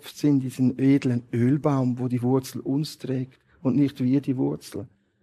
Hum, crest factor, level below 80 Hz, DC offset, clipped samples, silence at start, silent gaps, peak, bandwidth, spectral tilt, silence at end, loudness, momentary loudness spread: none; 16 dB; -66 dBFS; under 0.1%; under 0.1%; 0.05 s; none; -8 dBFS; 14 kHz; -8 dB/octave; 0.35 s; -24 LUFS; 9 LU